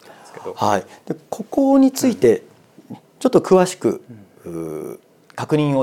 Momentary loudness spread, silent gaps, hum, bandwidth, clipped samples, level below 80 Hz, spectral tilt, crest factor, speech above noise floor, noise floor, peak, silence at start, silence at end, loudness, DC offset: 19 LU; none; none; 16 kHz; under 0.1%; -60 dBFS; -6 dB/octave; 18 dB; 22 dB; -40 dBFS; -2 dBFS; 0.35 s; 0 s; -18 LUFS; under 0.1%